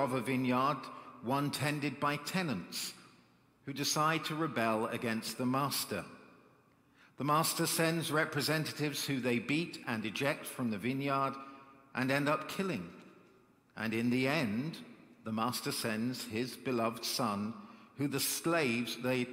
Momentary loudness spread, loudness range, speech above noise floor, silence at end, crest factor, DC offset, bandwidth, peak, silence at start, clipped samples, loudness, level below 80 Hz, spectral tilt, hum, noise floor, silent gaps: 11 LU; 3 LU; 32 dB; 0 s; 20 dB; under 0.1%; 16 kHz; -16 dBFS; 0 s; under 0.1%; -34 LUFS; -76 dBFS; -4 dB/octave; none; -67 dBFS; none